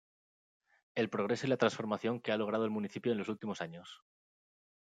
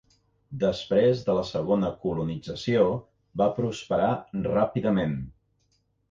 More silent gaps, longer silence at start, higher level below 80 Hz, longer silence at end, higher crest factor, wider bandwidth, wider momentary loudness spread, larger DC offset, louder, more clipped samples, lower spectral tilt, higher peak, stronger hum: neither; first, 0.95 s vs 0.5 s; second, -80 dBFS vs -52 dBFS; first, 0.95 s vs 0.8 s; first, 22 dB vs 16 dB; first, 9.2 kHz vs 7.6 kHz; about the same, 11 LU vs 9 LU; neither; second, -35 LUFS vs -26 LUFS; neither; second, -6 dB/octave vs -7.5 dB/octave; second, -14 dBFS vs -10 dBFS; neither